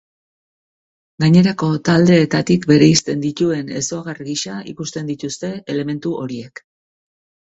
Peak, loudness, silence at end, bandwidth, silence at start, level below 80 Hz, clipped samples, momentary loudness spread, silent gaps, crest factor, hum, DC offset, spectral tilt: 0 dBFS; -17 LUFS; 1.05 s; 8.2 kHz; 1.2 s; -52 dBFS; under 0.1%; 15 LU; none; 18 dB; none; under 0.1%; -5.5 dB/octave